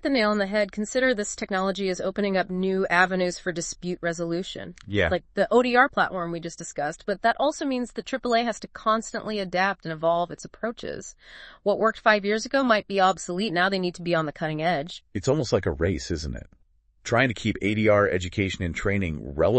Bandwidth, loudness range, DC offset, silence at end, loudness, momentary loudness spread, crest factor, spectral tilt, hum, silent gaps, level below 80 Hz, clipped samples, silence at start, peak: 8.8 kHz; 3 LU; under 0.1%; 0 s; -25 LUFS; 11 LU; 20 dB; -5 dB/octave; none; none; -48 dBFS; under 0.1%; 0.05 s; -4 dBFS